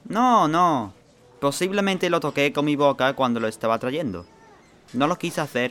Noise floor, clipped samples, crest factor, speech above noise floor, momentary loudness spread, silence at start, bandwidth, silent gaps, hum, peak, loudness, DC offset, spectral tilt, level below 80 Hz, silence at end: -51 dBFS; under 0.1%; 18 dB; 30 dB; 9 LU; 0.05 s; 16.5 kHz; none; none; -6 dBFS; -22 LUFS; under 0.1%; -5 dB/octave; -62 dBFS; 0 s